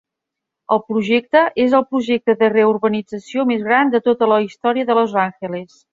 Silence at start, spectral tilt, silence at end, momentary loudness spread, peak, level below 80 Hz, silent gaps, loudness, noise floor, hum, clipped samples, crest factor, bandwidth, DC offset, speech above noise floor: 0.7 s; -6.5 dB/octave; 0.3 s; 8 LU; -2 dBFS; -62 dBFS; none; -17 LUFS; -82 dBFS; none; under 0.1%; 16 dB; 7.6 kHz; under 0.1%; 65 dB